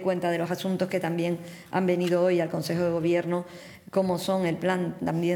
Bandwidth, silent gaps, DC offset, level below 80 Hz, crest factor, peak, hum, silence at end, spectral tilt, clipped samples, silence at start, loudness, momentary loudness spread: 19 kHz; none; under 0.1%; -66 dBFS; 14 dB; -12 dBFS; none; 0 s; -6.5 dB/octave; under 0.1%; 0 s; -27 LUFS; 7 LU